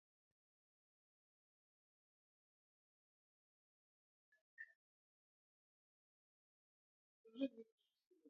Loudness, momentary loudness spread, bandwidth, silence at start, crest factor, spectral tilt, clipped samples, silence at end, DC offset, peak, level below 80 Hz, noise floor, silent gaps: -51 LUFS; 16 LU; 3.8 kHz; 4.6 s; 30 dB; -2 dB/octave; under 0.1%; 0 s; under 0.1%; -32 dBFS; under -90 dBFS; under -90 dBFS; 4.75-7.24 s, 7.72-7.78 s, 8.07-8.11 s